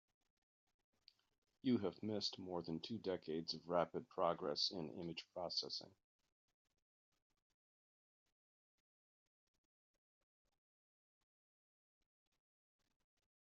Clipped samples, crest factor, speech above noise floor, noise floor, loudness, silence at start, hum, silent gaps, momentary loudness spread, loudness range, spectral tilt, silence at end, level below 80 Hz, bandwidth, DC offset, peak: under 0.1%; 24 dB; over 46 dB; under -90 dBFS; -44 LUFS; 1.65 s; none; none; 8 LU; 8 LU; -4 dB/octave; 7.5 s; -86 dBFS; 7.4 kHz; under 0.1%; -24 dBFS